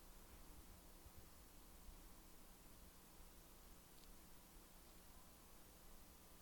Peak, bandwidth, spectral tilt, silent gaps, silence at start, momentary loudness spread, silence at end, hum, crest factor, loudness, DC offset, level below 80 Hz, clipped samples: -44 dBFS; 19 kHz; -3.5 dB/octave; none; 0 s; 1 LU; 0 s; none; 18 dB; -64 LUFS; under 0.1%; -66 dBFS; under 0.1%